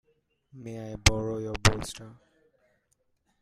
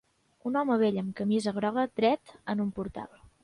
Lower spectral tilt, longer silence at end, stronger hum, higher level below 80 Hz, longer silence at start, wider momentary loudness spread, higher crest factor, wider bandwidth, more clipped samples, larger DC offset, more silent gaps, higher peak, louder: second, -3.5 dB/octave vs -6.5 dB/octave; first, 1.25 s vs 0.4 s; neither; first, -40 dBFS vs -62 dBFS; about the same, 0.55 s vs 0.45 s; first, 18 LU vs 12 LU; first, 28 dB vs 16 dB; first, 15.5 kHz vs 11 kHz; neither; neither; neither; first, -2 dBFS vs -14 dBFS; first, -27 LUFS vs -30 LUFS